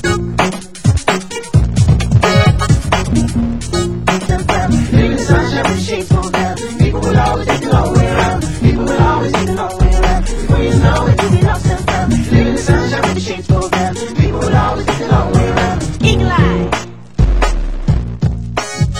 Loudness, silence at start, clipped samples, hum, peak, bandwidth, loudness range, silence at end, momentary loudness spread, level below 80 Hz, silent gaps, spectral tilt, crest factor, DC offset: -14 LUFS; 0 s; 0.2%; none; 0 dBFS; 16 kHz; 1 LU; 0 s; 6 LU; -20 dBFS; none; -6 dB/octave; 12 dB; 2%